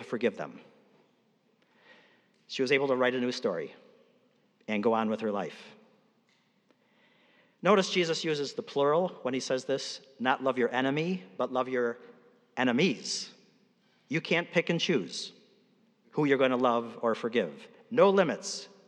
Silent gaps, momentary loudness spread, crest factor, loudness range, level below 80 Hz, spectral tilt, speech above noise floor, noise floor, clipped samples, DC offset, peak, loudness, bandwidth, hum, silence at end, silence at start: none; 13 LU; 20 dB; 5 LU; under -90 dBFS; -4.5 dB/octave; 41 dB; -70 dBFS; under 0.1%; under 0.1%; -10 dBFS; -29 LUFS; 10.5 kHz; none; 0.2 s; 0 s